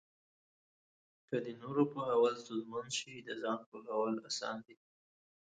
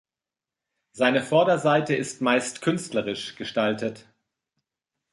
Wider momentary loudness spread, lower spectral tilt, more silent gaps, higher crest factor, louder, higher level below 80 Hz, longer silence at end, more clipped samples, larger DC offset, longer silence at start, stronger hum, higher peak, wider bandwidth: about the same, 10 LU vs 10 LU; about the same, -4 dB/octave vs -4.5 dB/octave; first, 3.66-3.72 s vs none; about the same, 20 dB vs 20 dB; second, -38 LUFS vs -24 LUFS; second, -82 dBFS vs -68 dBFS; second, 0.85 s vs 1.15 s; neither; neither; first, 1.3 s vs 0.95 s; neither; second, -20 dBFS vs -6 dBFS; second, 9 kHz vs 11.5 kHz